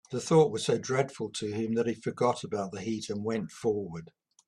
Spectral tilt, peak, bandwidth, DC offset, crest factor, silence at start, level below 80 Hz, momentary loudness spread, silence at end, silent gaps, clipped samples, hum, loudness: -5.5 dB/octave; -10 dBFS; 11.5 kHz; under 0.1%; 20 dB; 0.1 s; -68 dBFS; 11 LU; 0.4 s; none; under 0.1%; none; -30 LUFS